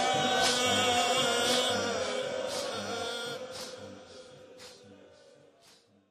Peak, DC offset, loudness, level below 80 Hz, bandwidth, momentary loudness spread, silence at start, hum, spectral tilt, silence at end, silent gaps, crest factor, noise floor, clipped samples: -14 dBFS; under 0.1%; -29 LUFS; -66 dBFS; 16 kHz; 24 LU; 0 s; none; -1.5 dB/octave; 1.15 s; none; 18 dB; -62 dBFS; under 0.1%